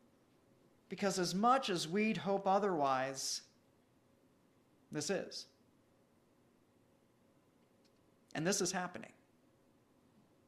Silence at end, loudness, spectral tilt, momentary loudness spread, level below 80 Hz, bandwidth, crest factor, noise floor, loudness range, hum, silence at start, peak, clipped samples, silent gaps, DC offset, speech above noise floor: 1.4 s; -36 LUFS; -3.5 dB/octave; 15 LU; -80 dBFS; 14 kHz; 22 dB; -71 dBFS; 12 LU; none; 0.9 s; -18 dBFS; under 0.1%; none; under 0.1%; 35 dB